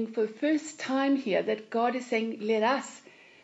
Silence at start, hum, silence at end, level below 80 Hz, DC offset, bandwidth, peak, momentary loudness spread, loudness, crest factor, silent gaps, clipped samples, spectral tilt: 0 s; none; 0.45 s; -86 dBFS; under 0.1%; 8 kHz; -14 dBFS; 5 LU; -29 LUFS; 16 dB; none; under 0.1%; -4.5 dB/octave